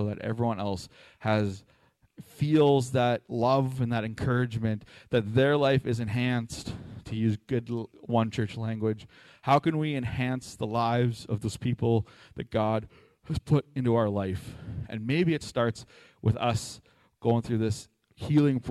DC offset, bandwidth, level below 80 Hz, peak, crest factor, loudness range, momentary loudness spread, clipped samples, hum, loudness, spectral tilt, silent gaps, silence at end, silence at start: under 0.1%; 13 kHz; -54 dBFS; -10 dBFS; 18 dB; 3 LU; 13 LU; under 0.1%; none; -28 LUFS; -7 dB/octave; none; 0 s; 0 s